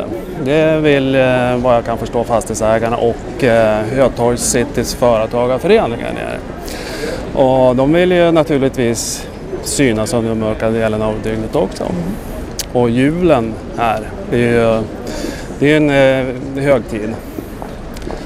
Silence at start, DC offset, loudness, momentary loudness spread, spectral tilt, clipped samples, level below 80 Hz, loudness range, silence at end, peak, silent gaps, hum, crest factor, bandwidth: 0 s; under 0.1%; -15 LUFS; 12 LU; -5.5 dB/octave; under 0.1%; -32 dBFS; 3 LU; 0 s; 0 dBFS; none; none; 14 dB; 16 kHz